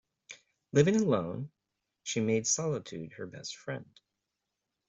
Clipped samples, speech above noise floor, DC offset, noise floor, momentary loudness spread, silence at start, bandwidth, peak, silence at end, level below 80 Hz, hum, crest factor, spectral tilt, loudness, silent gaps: under 0.1%; 55 dB; under 0.1%; -86 dBFS; 22 LU; 0.3 s; 8.2 kHz; -10 dBFS; 1.05 s; -68 dBFS; none; 22 dB; -4.5 dB/octave; -31 LUFS; none